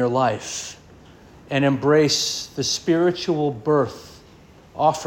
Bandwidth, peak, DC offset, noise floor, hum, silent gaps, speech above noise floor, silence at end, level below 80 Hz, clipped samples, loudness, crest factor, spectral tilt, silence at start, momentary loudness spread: 17 kHz; -4 dBFS; under 0.1%; -48 dBFS; none; none; 27 dB; 0 s; -56 dBFS; under 0.1%; -21 LUFS; 18 dB; -4.5 dB/octave; 0 s; 13 LU